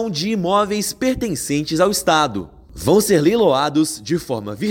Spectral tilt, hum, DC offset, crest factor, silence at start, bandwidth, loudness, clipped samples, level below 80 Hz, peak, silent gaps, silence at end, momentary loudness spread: -4.5 dB/octave; none; under 0.1%; 14 dB; 0 s; 17 kHz; -18 LUFS; under 0.1%; -44 dBFS; -4 dBFS; none; 0 s; 9 LU